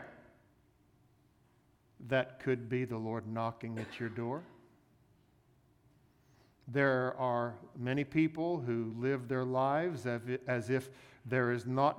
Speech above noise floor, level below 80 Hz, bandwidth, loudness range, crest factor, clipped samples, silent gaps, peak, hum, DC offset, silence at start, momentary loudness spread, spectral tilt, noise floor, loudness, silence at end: 35 dB; -72 dBFS; 13.5 kHz; 8 LU; 20 dB; under 0.1%; none; -16 dBFS; none; under 0.1%; 0 s; 10 LU; -7.5 dB/octave; -69 dBFS; -35 LUFS; 0 s